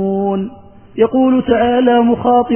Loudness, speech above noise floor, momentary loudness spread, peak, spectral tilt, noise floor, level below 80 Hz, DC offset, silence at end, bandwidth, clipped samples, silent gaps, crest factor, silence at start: -13 LUFS; 24 dB; 10 LU; 0 dBFS; -10.5 dB/octave; -35 dBFS; -44 dBFS; 0.4%; 0 s; 3.3 kHz; under 0.1%; none; 12 dB; 0 s